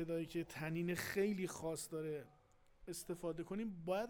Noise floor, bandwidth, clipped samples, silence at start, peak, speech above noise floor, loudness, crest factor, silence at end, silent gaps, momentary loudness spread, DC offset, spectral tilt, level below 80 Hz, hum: -65 dBFS; over 20 kHz; under 0.1%; 0 s; -26 dBFS; 23 dB; -43 LUFS; 16 dB; 0 s; none; 11 LU; under 0.1%; -5.5 dB/octave; -68 dBFS; none